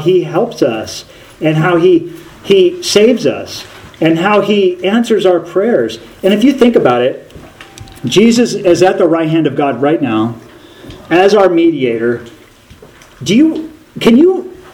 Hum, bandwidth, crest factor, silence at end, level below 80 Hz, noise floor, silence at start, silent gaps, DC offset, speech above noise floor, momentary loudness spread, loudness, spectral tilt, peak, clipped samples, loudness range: none; 16.5 kHz; 12 dB; 0.05 s; -48 dBFS; -39 dBFS; 0 s; none; under 0.1%; 29 dB; 14 LU; -11 LUFS; -5.5 dB/octave; 0 dBFS; 0.3%; 2 LU